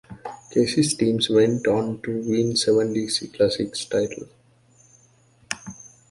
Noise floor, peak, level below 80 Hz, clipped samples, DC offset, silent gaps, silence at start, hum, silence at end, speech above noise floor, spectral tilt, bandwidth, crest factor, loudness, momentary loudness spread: -57 dBFS; -4 dBFS; -58 dBFS; under 0.1%; under 0.1%; none; 0.1 s; none; 0.25 s; 36 dB; -4.5 dB/octave; 11.5 kHz; 20 dB; -22 LUFS; 16 LU